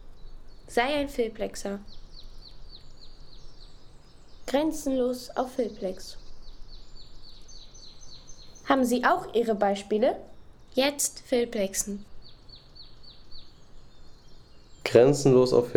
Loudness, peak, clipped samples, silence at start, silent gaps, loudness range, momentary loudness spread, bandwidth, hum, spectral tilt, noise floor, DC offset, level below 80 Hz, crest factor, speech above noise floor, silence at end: -26 LUFS; -6 dBFS; under 0.1%; 0 s; none; 11 LU; 28 LU; 18.5 kHz; none; -4.5 dB/octave; -48 dBFS; under 0.1%; -48 dBFS; 22 dB; 23 dB; 0 s